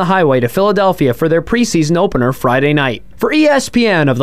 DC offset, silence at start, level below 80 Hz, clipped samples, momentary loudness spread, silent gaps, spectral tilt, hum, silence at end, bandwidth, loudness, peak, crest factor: 2%; 0 s; -38 dBFS; under 0.1%; 3 LU; none; -5.5 dB/octave; none; 0 s; 16 kHz; -13 LUFS; -2 dBFS; 10 dB